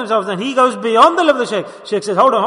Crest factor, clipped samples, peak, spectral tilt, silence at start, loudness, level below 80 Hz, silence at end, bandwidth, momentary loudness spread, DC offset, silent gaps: 14 dB; under 0.1%; 0 dBFS; -4.5 dB/octave; 0 s; -14 LUFS; -62 dBFS; 0 s; 11 kHz; 11 LU; under 0.1%; none